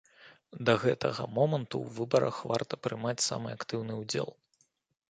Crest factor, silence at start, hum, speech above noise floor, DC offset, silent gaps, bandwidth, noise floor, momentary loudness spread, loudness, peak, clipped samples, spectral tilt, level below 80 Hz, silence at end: 24 dB; 0.2 s; none; 42 dB; under 0.1%; none; 9.6 kHz; -73 dBFS; 9 LU; -32 LUFS; -8 dBFS; under 0.1%; -4.5 dB/octave; -68 dBFS; 0.75 s